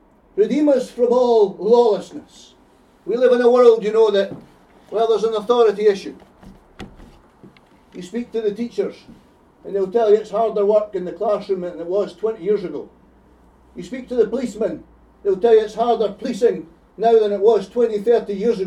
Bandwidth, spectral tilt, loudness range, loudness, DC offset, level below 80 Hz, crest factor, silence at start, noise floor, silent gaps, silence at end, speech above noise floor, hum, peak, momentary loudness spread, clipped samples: 10.5 kHz; -6 dB/octave; 8 LU; -18 LUFS; under 0.1%; -56 dBFS; 18 dB; 0.35 s; -52 dBFS; none; 0 s; 35 dB; none; 0 dBFS; 15 LU; under 0.1%